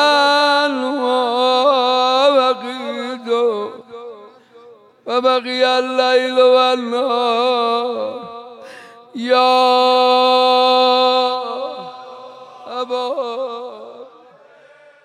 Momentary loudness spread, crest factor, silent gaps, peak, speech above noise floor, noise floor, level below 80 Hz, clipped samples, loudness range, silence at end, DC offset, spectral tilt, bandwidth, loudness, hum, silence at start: 22 LU; 14 dB; none; -4 dBFS; 32 dB; -46 dBFS; -80 dBFS; under 0.1%; 7 LU; 1 s; under 0.1%; -2.5 dB/octave; 12 kHz; -15 LUFS; none; 0 s